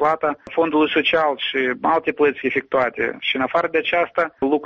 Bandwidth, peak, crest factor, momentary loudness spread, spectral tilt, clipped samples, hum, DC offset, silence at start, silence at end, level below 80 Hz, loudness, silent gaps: 7 kHz; -4 dBFS; 16 dB; 5 LU; -1.5 dB/octave; under 0.1%; none; under 0.1%; 0 s; 0 s; -58 dBFS; -20 LUFS; none